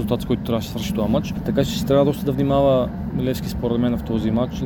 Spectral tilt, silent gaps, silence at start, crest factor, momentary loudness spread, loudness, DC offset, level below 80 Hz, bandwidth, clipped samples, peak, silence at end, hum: -7 dB/octave; none; 0 s; 16 dB; 6 LU; -21 LUFS; under 0.1%; -36 dBFS; 18 kHz; under 0.1%; -4 dBFS; 0 s; none